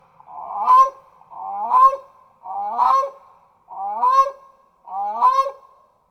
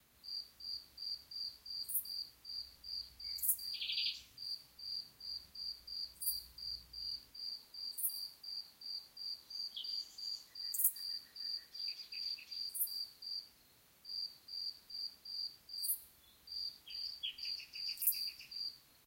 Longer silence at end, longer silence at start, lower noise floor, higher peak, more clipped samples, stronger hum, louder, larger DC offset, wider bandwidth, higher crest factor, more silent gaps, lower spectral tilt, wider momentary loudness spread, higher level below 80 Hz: first, 0.55 s vs 0.05 s; first, 0.3 s vs 0.15 s; second, -53 dBFS vs -67 dBFS; first, -4 dBFS vs -14 dBFS; neither; neither; first, -18 LUFS vs -41 LUFS; neither; second, 8.4 kHz vs 16.5 kHz; second, 16 dB vs 30 dB; neither; first, -2 dB/octave vs 2.5 dB/octave; first, 18 LU vs 10 LU; first, -62 dBFS vs -74 dBFS